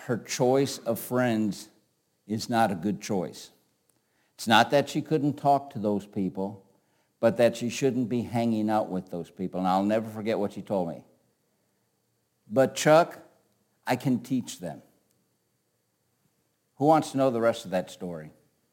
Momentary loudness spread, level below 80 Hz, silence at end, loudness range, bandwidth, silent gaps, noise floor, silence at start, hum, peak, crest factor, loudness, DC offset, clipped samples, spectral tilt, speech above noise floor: 15 LU; -72 dBFS; 0.45 s; 4 LU; 17 kHz; none; -74 dBFS; 0 s; none; -4 dBFS; 24 dB; -27 LUFS; under 0.1%; under 0.1%; -5.5 dB/octave; 48 dB